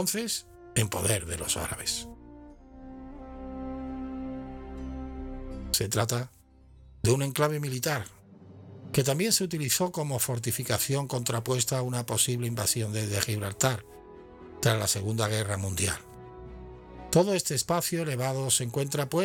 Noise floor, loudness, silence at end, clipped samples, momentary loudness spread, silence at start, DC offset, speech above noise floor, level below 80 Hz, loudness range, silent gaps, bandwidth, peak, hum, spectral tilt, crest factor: -55 dBFS; -28 LUFS; 0 s; under 0.1%; 20 LU; 0 s; under 0.1%; 27 dB; -50 dBFS; 7 LU; none; 19.5 kHz; -6 dBFS; none; -4 dB/octave; 24 dB